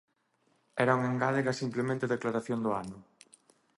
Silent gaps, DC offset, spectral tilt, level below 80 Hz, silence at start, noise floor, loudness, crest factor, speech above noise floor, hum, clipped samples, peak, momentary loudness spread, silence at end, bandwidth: none; under 0.1%; -6.5 dB/octave; -70 dBFS; 0.75 s; -73 dBFS; -31 LUFS; 22 dB; 43 dB; none; under 0.1%; -12 dBFS; 11 LU; 0.75 s; 11.5 kHz